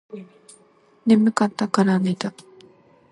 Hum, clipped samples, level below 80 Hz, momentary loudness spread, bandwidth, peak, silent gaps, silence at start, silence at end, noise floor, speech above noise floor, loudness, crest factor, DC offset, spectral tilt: none; under 0.1%; -68 dBFS; 17 LU; 11.5 kHz; -2 dBFS; none; 0.15 s; 0.8 s; -53 dBFS; 32 dB; -20 LUFS; 20 dB; under 0.1%; -6.5 dB/octave